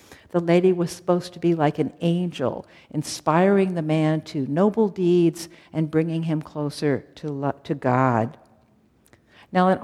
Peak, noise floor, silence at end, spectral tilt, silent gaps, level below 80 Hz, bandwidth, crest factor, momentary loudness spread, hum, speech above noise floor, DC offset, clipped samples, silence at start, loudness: -4 dBFS; -59 dBFS; 0 s; -7 dB/octave; none; -64 dBFS; 13 kHz; 18 dB; 10 LU; none; 37 dB; under 0.1%; under 0.1%; 0.1 s; -23 LUFS